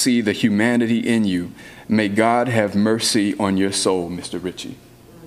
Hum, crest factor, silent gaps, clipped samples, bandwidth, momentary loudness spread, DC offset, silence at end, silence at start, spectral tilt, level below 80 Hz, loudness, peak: none; 18 dB; none; under 0.1%; 15 kHz; 11 LU; under 0.1%; 0 s; 0 s; -4.5 dB/octave; -56 dBFS; -19 LUFS; -2 dBFS